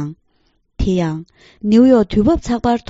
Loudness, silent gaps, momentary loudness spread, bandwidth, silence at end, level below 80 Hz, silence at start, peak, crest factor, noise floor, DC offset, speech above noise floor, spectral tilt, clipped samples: -15 LUFS; none; 15 LU; 8 kHz; 0.1 s; -32 dBFS; 0 s; 0 dBFS; 16 dB; -61 dBFS; under 0.1%; 47 dB; -7 dB/octave; under 0.1%